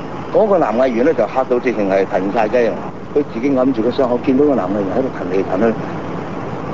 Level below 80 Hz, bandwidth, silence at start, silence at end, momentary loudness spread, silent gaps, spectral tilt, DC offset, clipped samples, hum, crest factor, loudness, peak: -46 dBFS; 7.6 kHz; 0 s; 0 s; 10 LU; none; -7.5 dB/octave; 2%; under 0.1%; none; 16 dB; -17 LUFS; -2 dBFS